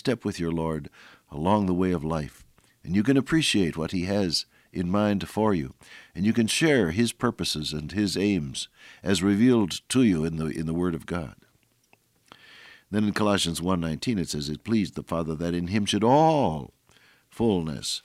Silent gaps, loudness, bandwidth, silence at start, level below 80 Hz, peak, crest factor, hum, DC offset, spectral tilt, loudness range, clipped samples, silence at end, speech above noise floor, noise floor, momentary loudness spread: none; -25 LUFS; 15.5 kHz; 0.05 s; -52 dBFS; -8 dBFS; 18 dB; none; under 0.1%; -5 dB/octave; 4 LU; under 0.1%; 0.05 s; 40 dB; -65 dBFS; 12 LU